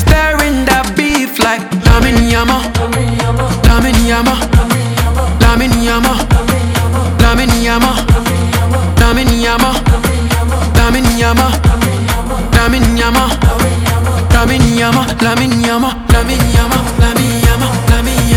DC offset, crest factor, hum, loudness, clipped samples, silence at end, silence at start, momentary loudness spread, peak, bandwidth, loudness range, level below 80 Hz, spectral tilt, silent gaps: under 0.1%; 10 dB; none; -11 LUFS; 0.5%; 0 s; 0 s; 4 LU; 0 dBFS; 19.5 kHz; 1 LU; -14 dBFS; -5 dB/octave; none